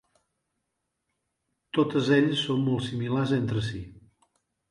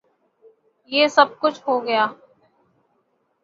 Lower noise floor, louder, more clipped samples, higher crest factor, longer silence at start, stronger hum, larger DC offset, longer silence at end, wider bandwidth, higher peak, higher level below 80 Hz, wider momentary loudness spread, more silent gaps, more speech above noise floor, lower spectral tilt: first, -81 dBFS vs -68 dBFS; second, -26 LUFS vs -19 LUFS; neither; about the same, 18 dB vs 22 dB; first, 1.75 s vs 0.9 s; neither; neither; second, 0.7 s vs 1.3 s; first, 11.5 kHz vs 7.8 kHz; second, -10 dBFS vs -2 dBFS; first, -58 dBFS vs -74 dBFS; first, 11 LU vs 8 LU; neither; first, 56 dB vs 49 dB; first, -6.5 dB/octave vs -3 dB/octave